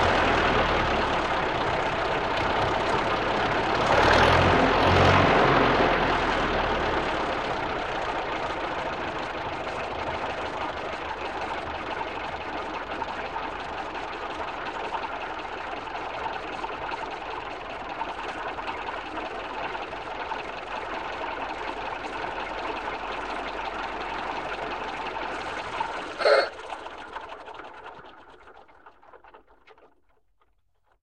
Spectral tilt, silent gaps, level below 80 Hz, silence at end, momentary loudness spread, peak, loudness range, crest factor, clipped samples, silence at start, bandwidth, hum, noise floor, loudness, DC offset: -5 dB/octave; none; -44 dBFS; 1.3 s; 13 LU; -8 dBFS; 12 LU; 20 dB; under 0.1%; 0 s; 12.5 kHz; none; -70 dBFS; -27 LUFS; 0.2%